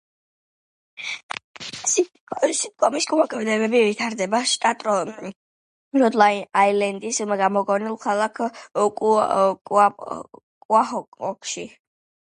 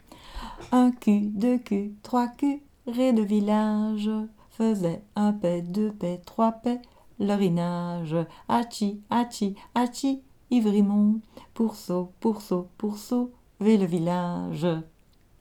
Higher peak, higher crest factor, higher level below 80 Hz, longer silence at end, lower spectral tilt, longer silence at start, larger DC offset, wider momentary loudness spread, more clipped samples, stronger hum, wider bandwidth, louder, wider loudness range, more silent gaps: first, -2 dBFS vs -10 dBFS; about the same, 20 dB vs 16 dB; second, -72 dBFS vs -56 dBFS; about the same, 0.65 s vs 0.55 s; second, -3 dB/octave vs -7 dB/octave; first, 1 s vs 0.25 s; neither; first, 14 LU vs 10 LU; neither; neither; second, 11.5 kHz vs 15.5 kHz; first, -21 LUFS vs -26 LUFS; about the same, 2 LU vs 2 LU; first, 1.23-1.29 s, 1.44-1.54 s, 2.20-2.27 s, 5.36-5.91 s, 9.61-9.65 s, 10.43-10.69 s, 11.08-11.12 s vs none